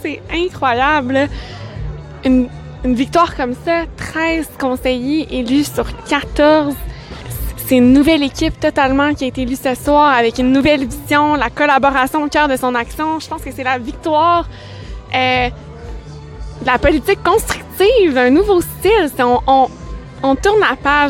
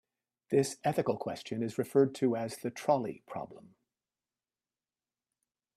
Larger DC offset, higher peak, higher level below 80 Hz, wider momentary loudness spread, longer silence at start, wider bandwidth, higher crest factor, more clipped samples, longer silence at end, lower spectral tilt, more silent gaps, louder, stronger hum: neither; first, 0 dBFS vs -14 dBFS; first, -32 dBFS vs -76 dBFS; about the same, 16 LU vs 14 LU; second, 0 s vs 0.5 s; first, 17 kHz vs 14.5 kHz; second, 14 dB vs 20 dB; neither; second, 0 s vs 2.15 s; about the same, -5 dB/octave vs -6 dB/octave; neither; first, -14 LUFS vs -32 LUFS; neither